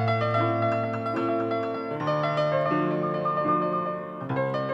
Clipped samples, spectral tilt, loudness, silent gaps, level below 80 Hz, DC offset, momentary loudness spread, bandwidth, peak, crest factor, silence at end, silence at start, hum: under 0.1%; -8.5 dB/octave; -26 LUFS; none; -68 dBFS; under 0.1%; 5 LU; 8 kHz; -12 dBFS; 14 dB; 0 s; 0 s; none